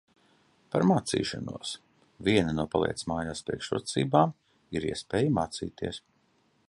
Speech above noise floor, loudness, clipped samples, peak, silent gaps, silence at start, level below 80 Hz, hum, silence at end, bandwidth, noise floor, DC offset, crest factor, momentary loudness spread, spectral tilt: 40 dB; -29 LUFS; under 0.1%; -8 dBFS; none; 0.7 s; -54 dBFS; none; 0.7 s; 11.5 kHz; -69 dBFS; under 0.1%; 22 dB; 12 LU; -5.5 dB/octave